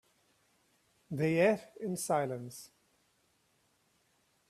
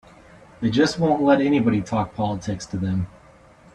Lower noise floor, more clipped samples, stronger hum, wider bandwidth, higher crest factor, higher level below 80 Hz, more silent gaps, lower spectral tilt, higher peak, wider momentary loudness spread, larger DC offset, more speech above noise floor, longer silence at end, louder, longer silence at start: first, -74 dBFS vs -50 dBFS; neither; neither; first, 14.5 kHz vs 10 kHz; about the same, 22 dB vs 18 dB; second, -76 dBFS vs -50 dBFS; neither; about the same, -5.5 dB/octave vs -6.5 dB/octave; second, -16 dBFS vs -4 dBFS; first, 16 LU vs 10 LU; neither; first, 41 dB vs 29 dB; first, 1.85 s vs 0.65 s; second, -33 LUFS vs -22 LUFS; first, 1.1 s vs 0.6 s